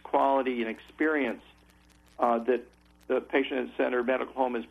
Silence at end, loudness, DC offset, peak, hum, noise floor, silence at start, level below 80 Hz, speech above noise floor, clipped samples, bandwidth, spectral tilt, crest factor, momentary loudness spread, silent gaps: 0.05 s; -29 LUFS; under 0.1%; -12 dBFS; none; -59 dBFS; 0.05 s; -64 dBFS; 31 dB; under 0.1%; 12 kHz; -6 dB/octave; 18 dB; 7 LU; none